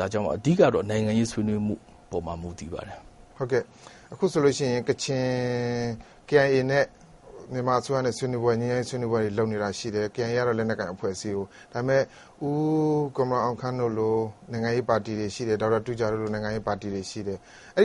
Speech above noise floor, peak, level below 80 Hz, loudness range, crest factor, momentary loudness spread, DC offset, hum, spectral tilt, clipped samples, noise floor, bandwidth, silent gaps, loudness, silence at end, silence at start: 21 dB; -6 dBFS; -54 dBFS; 3 LU; 20 dB; 12 LU; under 0.1%; none; -6 dB/octave; under 0.1%; -47 dBFS; 11.5 kHz; none; -27 LUFS; 0 s; 0 s